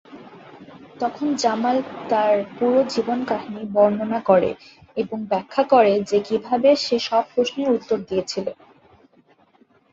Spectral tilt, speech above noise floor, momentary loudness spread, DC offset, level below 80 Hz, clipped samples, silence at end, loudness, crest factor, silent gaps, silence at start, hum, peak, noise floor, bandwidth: -5 dB/octave; 37 dB; 10 LU; under 0.1%; -62 dBFS; under 0.1%; 1.4 s; -21 LUFS; 18 dB; none; 0.1 s; none; -2 dBFS; -57 dBFS; 8 kHz